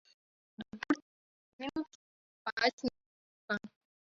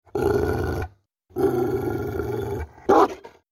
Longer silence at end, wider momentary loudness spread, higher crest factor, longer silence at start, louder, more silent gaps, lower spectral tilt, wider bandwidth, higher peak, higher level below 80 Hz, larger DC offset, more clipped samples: first, 0.45 s vs 0.25 s; first, 16 LU vs 13 LU; first, 26 dB vs 18 dB; first, 0.6 s vs 0.15 s; second, -37 LUFS vs -24 LUFS; first, 1.02-1.59 s, 1.95-2.45 s, 2.52-2.57 s, 2.73-2.78 s, 3.06-3.48 s vs none; second, -1.5 dB/octave vs -7.5 dB/octave; second, 7.4 kHz vs 16 kHz; second, -14 dBFS vs -6 dBFS; second, -72 dBFS vs -40 dBFS; neither; neither